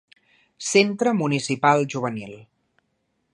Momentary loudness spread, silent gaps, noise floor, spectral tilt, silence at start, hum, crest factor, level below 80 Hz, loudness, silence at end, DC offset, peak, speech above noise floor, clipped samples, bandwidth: 13 LU; none; -72 dBFS; -4.5 dB/octave; 0.6 s; none; 20 dB; -70 dBFS; -21 LUFS; 0.9 s; under 0.1%; -4 dBFS; 51 dB; under 0.1%; 11.5 kHz